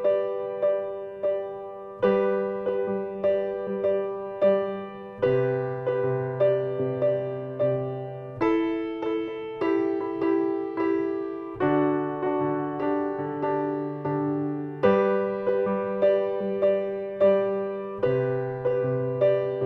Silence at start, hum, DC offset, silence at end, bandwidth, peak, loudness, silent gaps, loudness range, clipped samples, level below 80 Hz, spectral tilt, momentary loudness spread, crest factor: 0 s; none; under 0.1%; 0 s; 5.6 kHz; -10 dBFS; -26 LUFS; none; 2 LU; under 0.1%; -62 dBFS; -9.5 dB/octave; 7 LU; 16 dB